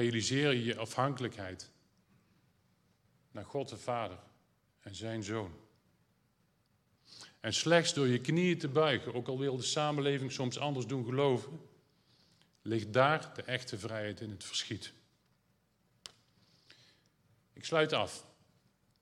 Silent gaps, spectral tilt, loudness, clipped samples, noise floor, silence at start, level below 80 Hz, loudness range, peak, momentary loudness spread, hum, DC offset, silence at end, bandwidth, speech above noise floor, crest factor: none; -4.5 dB/octave; -34 LUFS; under 0.1%; -74 dBFS; 0 s; -80 dBFS; 13 LU; -12 dBFS; 20 LU; none; under 0.1%; 0.8 s; 13 kHz; 41 dB; 24 dB